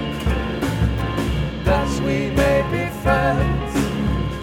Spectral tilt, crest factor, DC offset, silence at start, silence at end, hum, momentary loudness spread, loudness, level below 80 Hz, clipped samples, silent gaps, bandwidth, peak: -6.5 dB/octave; 16 dB; under 0.1%; 0 s; 0 s; none; 5 LU; -21 LUFS; -28 dBFS; under 0.1%; none; 16.5 kHz; -4 dBFS